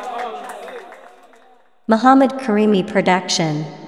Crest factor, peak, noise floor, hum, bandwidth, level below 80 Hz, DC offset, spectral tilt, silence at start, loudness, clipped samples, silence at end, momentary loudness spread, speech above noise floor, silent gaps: 18 dB; 0 dBFS; -53 dBFS; none; 12 kHz; -68 dBFS; 0.2%; -5 dB/octave; 0 s; -16 LUFS; under 0.1%; 0 s; 20 LU; 37 dB; none